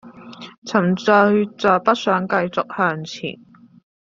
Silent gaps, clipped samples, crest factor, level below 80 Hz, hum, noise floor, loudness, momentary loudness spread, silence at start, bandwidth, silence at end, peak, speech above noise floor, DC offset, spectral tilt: 0.58-0.62 s; under 0.1%; 18 dB; -62 dBFS; none; -39 dBFS; -18 LUFS; 16 LU; 0.05 s; 7.6 kHz; 0.7 s; -2 dBFS; 21 dB; under 0.1%; -6 dB/octave